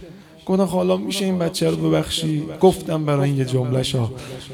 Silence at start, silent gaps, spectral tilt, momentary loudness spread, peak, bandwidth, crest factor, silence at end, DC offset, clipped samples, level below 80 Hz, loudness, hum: 0 s; none; -6 dB/octave; 7 LU; -4 dBFS; 16.5 kHz; 16 dB; 0 s; under 0.1%; under 0.1%; -48 dBFS; -20 LUFS; none